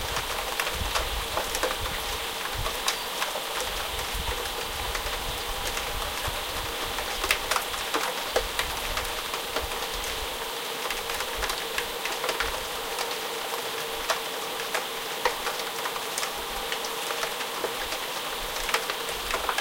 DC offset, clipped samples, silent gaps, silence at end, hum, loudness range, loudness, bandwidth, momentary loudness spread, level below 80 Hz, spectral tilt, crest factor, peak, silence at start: under 0.1%; under 0.1%; none; 0 s; none; 2 LU; -29 LUFS; 17 kHz; 3 LU; -42 dBFS; -1.5 dB/octave; 24 dB; -6 dBFS; 0 s